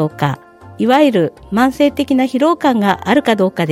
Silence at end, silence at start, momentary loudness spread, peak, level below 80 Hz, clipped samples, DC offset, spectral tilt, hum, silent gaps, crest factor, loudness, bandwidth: 0 s; 0 s; 8 LU; 0 dBFS; -48 dBFS; under 0.1%; under 0.1%; -6.5 dB/octave; none; none; 14 dB; -14 LUFS; 16 kHz